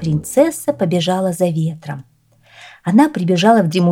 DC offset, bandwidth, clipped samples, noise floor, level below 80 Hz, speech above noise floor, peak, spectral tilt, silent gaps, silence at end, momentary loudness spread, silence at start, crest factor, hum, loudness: under 0.1%; 16.5 kHz; under 0.1%; -50 dBFS; -56 dBFS; 35 dB; 0 dBFS; -6 dB/octave; none; 0 s; 14 LU; 0 s; 16 dB; none; -16 LUFS